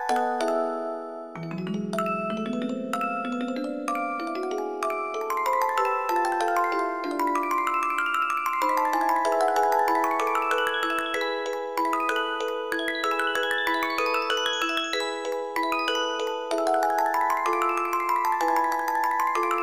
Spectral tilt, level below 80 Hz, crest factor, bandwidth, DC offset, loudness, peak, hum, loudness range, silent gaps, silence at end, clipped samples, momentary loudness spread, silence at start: -3.5 dB/octave; -72 dBFS; 16 dB; 15.5 kHz; 0.2%; -26 LUFS; -10 dBFS; none; 5 LU; none; 0 s; under 0.1%; 6 LU; 0 s